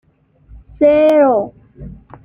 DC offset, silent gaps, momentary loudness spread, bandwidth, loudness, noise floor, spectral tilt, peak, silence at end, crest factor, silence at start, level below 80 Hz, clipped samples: under 0.1%; none; 10 LU; 5.2 kHz; -12 LUFS; -48 dBFS; -7.5 dB/octave; -2 dBFS; 0.35 s; 14 dB; 0.8 s; -44 dBFS; under 0.1%